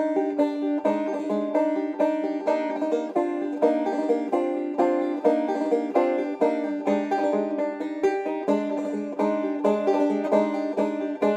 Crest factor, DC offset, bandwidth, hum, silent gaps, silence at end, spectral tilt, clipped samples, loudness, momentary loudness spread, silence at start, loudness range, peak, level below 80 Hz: 16 dB; under 0.1%; 8.6 kHz; none; none; 0 s; -7 dB/octave; under 0.1%; -25 LUFS; 4 LU; 0 s; 1 LU; -8 dBFS; -76 dBFS